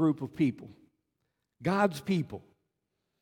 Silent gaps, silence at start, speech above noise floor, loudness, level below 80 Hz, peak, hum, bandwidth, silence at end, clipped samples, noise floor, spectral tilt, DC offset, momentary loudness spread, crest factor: none; 0 s; 53 dB; -31 LUFS; -68 dBFS; -14 dBFS; none; 17 kHz; 0.8 s; under 0.1%; -83 dBFS; -7 dB/octave; under 0.1%; 15 LU; 18 dB